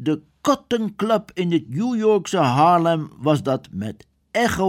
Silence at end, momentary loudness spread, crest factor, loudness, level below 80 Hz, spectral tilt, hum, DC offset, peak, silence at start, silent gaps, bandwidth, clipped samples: 0 s; 10 LU; 16 dB; -20 LUFS; -52 dBFS; -6 dB/octave; none; under 0.1%; -4 dBFS; 0 s; none; 16 kHz; under 0.1%